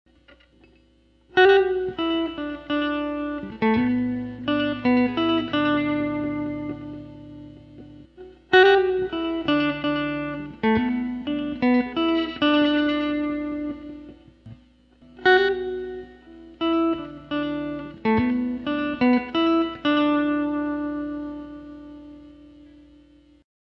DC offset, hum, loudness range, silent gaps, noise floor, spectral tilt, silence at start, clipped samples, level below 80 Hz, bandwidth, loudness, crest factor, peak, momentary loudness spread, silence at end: under 0.1%; none; 4 LU; none; -59 dBFS; -7 dB/octave; 1.35 s; under 0.1%; -52 dBFS; 6 kHz; -23 LUFS; 20 dB; -4 dBFS; 17 LU; 1.3 s